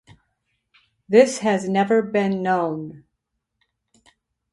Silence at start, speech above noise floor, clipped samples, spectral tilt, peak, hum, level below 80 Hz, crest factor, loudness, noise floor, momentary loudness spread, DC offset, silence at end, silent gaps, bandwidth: 1.1 s; 59 dB; under 0.1%; -5.5 dB/octave; -2 dBFS; none; -66 dBFS; 22 dB; -20 LUFS; -78 dBFS; 11 LU; under 0.1%; 1.55 s; none; 11.5 kHz